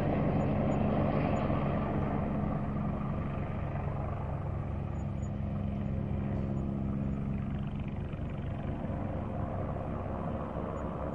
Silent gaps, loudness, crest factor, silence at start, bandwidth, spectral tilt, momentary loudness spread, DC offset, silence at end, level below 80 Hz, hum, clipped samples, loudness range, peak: none; -34 LUFS; 16 dB; 0 s; 7.4 kHz; -9.5 dB/octave; 7 LU; under 0.1%; 0 s; -42 dBFS; none; under 0.1%; 5 LU; -16 dBFS